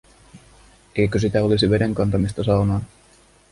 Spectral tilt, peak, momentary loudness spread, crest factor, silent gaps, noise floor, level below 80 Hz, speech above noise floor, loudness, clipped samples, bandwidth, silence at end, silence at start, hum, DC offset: -7 dB/octave; -6 dBFS; 8 LU; 16 dB; none; -53 dBFS; -40 dBFS; 34 dB; -20 LUFS; under 0.1%; 11.5 kHz; 0.65 s; 0.35 s; none; under 0.1%